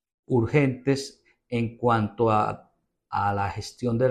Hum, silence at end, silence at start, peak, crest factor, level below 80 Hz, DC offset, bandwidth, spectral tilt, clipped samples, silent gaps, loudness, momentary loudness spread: none; 0 s; 0.3 s; -8 dBFS; 18 dB; -54 dBFS; under 0.1%; 12 kHz; -7 dB/octave; under 0.1%; none; -26 LUFS; 9 LU